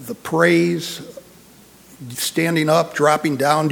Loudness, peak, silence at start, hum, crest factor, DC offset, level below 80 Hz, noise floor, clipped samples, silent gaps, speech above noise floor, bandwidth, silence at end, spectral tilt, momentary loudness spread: -18 LUFS; -2 dBFS; 0 s; none; 18 dB; under 0.1%; -60 dBFS; -47 dBFS; under 0.1%; none; 29 dB; 19.5 kHz; 0 s; -5 dB/octave; 17 LU